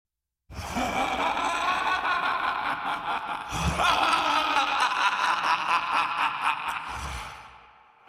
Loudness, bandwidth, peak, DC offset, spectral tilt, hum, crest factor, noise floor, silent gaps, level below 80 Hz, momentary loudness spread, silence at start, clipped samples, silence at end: -26 LUFS; 16 kHz; -8 dBFS; under 0.1%; -3 dB/octave; none; 20 dB; -54 dBFS; none; -46 dBFS; 11 LU; 0.5 s; under 0.1%; 0.5 s